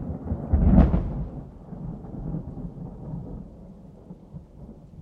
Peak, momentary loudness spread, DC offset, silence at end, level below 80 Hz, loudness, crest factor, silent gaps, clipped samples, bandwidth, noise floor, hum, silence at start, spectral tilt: -4 dBFS; 26 LU; under 0.1%; 0 s; -30 dBFS; -26 LUFS; 22 dB; none; under 0.1%; 3.6 kHz; -45 dBFS; none; 0 s; -11.5 dB/octave